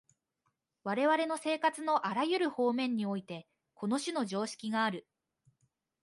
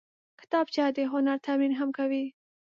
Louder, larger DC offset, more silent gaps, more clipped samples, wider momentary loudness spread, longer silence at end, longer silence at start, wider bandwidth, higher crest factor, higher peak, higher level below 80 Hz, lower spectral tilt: second, -33 LUFS vs -29 LUFS; neither; neither; neither; first, 11 LU vs 4 LU; first, 1.05 s vs 0.4 s; first, 0.85 s vs 0.5 s; first, 11.5 kHz vs 7 kHz; about the same, 18 dB vs 16 dB; about the same, -16 dBFS vs -14 dBFS; about the same, -84 dBFS vs -86 dBFS; about the same, -4.5 dB/octave vs -4.5 dB/octave